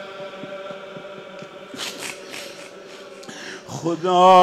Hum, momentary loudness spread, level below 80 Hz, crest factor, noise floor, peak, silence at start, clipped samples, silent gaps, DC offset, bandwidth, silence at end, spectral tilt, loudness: none; 18 LU; -70 dBFS; 20 dB; -40 dBFS; -2 dBFS; 0 s; under 0.1%; none; under 0.1%; 15 kHz; 0 s; -4.5 dB/octave; -24 LUFS